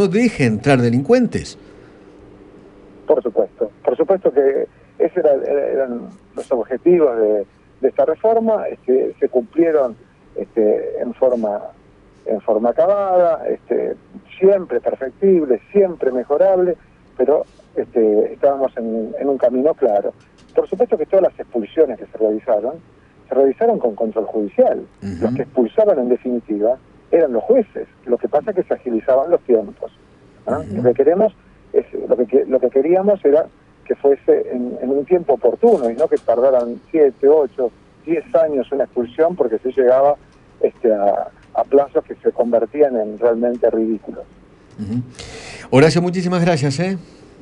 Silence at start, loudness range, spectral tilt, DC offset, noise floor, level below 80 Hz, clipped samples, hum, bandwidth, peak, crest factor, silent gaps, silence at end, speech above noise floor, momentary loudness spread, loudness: 0 s; 3 LU; -7.5 dB/octave; under 0.1%; -43 dBFS; -52 dBFS; under 0.1%; none; 10.5 kHz; 0 dBFS; 16 dB; none; 0.4 s; 26 dB; 11 LU; -17 LUFS